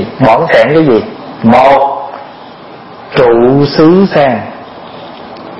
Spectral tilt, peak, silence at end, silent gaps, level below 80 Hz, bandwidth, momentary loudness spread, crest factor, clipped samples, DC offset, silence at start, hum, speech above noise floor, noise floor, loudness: -8 dB/octave; 0 dBFS; 0 s; none; -42 dBFS; 8.4 kHz; 21 LU; 10 dB; 1%; under 0.1%; 0 s; none; 23 dB; -30 dBFS; -7 LUFS